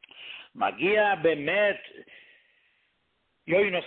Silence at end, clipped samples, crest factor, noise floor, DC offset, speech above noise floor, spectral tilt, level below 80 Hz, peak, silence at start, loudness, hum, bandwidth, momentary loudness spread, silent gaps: 0 s; under 0.1%; 16 dB; -74 dBFS; under 0.1%; 49 dB; -9 dB/octave; -68 dBFS; -12 dBFS; 0.15 s; -25 LUFS; none; 4.4 kHz; 19 LU; none